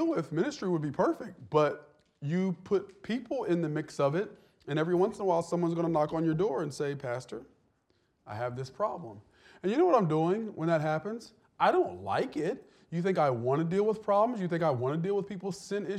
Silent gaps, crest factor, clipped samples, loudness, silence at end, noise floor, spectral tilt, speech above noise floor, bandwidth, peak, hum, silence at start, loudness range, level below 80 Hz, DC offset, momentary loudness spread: none; 18 dB; under 0.1%; -31 LUFS; 0 s; -73 dBFS; -7 dB/octave; 43 dB; 11.5 kHz; -12 dBFS; none; 0 s; 4 LU; -70 dBFS; under 0.1%; 11 LU